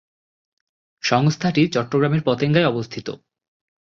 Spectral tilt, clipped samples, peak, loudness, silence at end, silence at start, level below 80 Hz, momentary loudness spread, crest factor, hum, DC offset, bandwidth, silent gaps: -6 dB/octave; under 0.1%; -4 dBFS; -19 LUFS; 0.85 s; 1.05 s; -58 dBFS; 13 LU; 18 dB; none; under 0.1%; 7.4 kHz; none